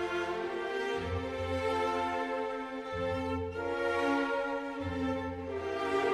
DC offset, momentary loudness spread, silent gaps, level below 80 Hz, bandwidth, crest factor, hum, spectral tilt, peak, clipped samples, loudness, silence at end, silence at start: under 0.1%; 6 LU; none; -56 dBFS; 13.5 kHz; 14 dB; none; -6 dB/octave; -20 dBFS; under 0.1%; -34 LUFS; 0 s; 0 s